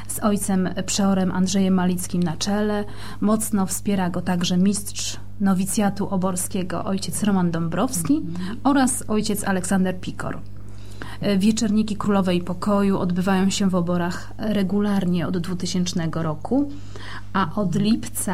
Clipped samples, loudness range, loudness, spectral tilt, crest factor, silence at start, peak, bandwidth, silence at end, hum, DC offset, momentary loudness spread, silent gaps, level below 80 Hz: under 0.1%; 2 LU; -22 LUFS; -5 dB/octave; 14 dB; 0 s; -8 dBFS; 15.5 kHz; 0 s; none; 3%; 9 LU; none; -44 dBFS